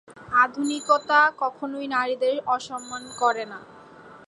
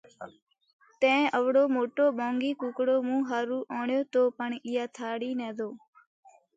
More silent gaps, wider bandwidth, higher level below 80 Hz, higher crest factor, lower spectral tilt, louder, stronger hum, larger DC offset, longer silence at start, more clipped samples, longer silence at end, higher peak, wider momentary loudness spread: second, none vs 0.42-0.47 s, 0.73-0.79 s; first, 11.5 kHz vs 7.8 kHz; first, -68 dBFS vs -82 dBFS; about the same, 20 dB vs 18 dB; second, -2.5 dB/octave vs -4.5 dB/octave; first, -23 LUFS vs -28 LUFS; neither; neither; about the same, 0.1 s vs 0.2 s; neither; second, 0.1 s vs 0.8 s; first, -6 dBFS vs -12 dBFS; first, 14 LU vs 11 LU